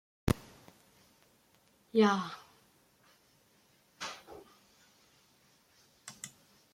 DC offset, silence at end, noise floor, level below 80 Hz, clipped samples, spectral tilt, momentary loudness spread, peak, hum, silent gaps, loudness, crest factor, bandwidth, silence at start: under 0.1%; 0.45 s; -68 dBFS; -58 dBFS; under 0.1%; -5.5 dB/octave; 26 LU; -12 dBFS; none; none; -34 LUFS; 28 dB; 16 kHz; 0.25 s